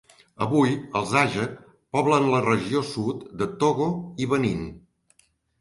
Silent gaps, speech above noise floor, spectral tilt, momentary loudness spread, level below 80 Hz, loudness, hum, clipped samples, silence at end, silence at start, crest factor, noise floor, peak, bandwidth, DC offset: none; 40 dB; -6 dB/octave; 10 LU; -54 dBFS; -24 LUFS; none; under 0.1%; 0.8 s; 0.4 s; 18 dB; -64 dBFS; -6 dBFS; 11.5 kHz; under 0.1%